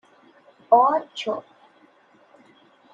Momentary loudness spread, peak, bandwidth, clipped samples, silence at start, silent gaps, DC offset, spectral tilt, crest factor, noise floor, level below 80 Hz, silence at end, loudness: 13 LU; -4 dBFS; 7.6 kHz; under 0.1%; 0.7 s; none; under 0.1%; -4 dB/octave; 22 dB; -57 dBFS; -86 dBFS; 1.55 s; -21 LUFS